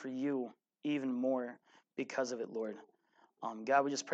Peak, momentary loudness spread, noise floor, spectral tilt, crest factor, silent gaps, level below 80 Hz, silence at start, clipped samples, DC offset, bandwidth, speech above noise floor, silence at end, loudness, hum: -16 dBFS; 14 LU; -71 dBFS; -4 dB/octave; 22 dB; none; under -90 dBFS; 0 s; under 0.1%; under 0.1%; 8.6 kHz; 35 dB; 0 s; -38 LUFS; none